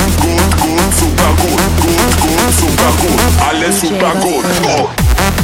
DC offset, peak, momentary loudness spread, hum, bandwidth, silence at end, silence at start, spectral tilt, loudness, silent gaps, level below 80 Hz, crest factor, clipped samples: under 0.1%; 0 dBFS; 2 LU; none; 17 kHz; 0 s; 0 s; -4 dB/octave; -11 LUFS; none; -18 dBFS; 10 dB; under 0.1%